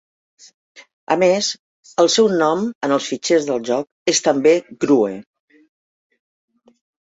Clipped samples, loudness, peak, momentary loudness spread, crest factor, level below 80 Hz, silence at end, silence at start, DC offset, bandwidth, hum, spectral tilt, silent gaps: under 0.1%; -18 LUFS; -2 dBFS; 8 LU; 18 dB; -66 dBFS; 1.9 s; 0.75 s; under 0.1%; 8.2 kHz; none; -3.5 dB/octave; 0.93-1.07 s, 1.59-1.83 s, 2.75-2.81 s, 3.92-4.06 s